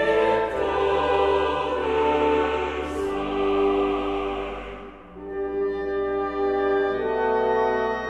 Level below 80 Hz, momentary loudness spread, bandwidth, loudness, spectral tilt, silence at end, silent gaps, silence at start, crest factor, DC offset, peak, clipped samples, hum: -44 dBFS; 10 LU; 9.8 kHz; -24 LUFS; -6 dB/octave; 0 s; none; 0 s; 14 dB; 0.1%; -10 dBFS; under 0.1%; none